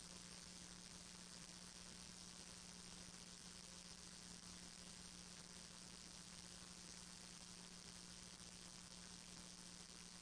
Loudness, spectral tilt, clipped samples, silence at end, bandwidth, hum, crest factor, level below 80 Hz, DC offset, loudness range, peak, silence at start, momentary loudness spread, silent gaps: -56 LUFS; -2 dB/octave; under 0.1%; 0 s; 10.5 kHz; none; 18 dB; -72 dBFS; under 0.1%; 0 LU; -40 dBFS; 0 s; 1 LU; none